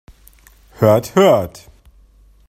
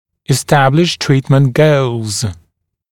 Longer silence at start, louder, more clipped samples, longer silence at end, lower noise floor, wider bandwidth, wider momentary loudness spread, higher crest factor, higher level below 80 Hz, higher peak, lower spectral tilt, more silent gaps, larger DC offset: first, 0.8 s vs 0.3 s; about the same, -14 LUFS vs -13 LUFS; neither; first, 1 s vs 0.6 s; second, -48 dBFS vs -61 dBFS; about the same, 16 kHz vs 16 kHz; about the same, 6 LU vs 8 LU; about the same, 18 dB vs 14 dB; about the same, -48 dBFS vs -46 dBFS; about the same, 0 dBFS vs 0 dBFS; about the same, -6.5 dB/octave vs -5.5 dB/octave; neither; neither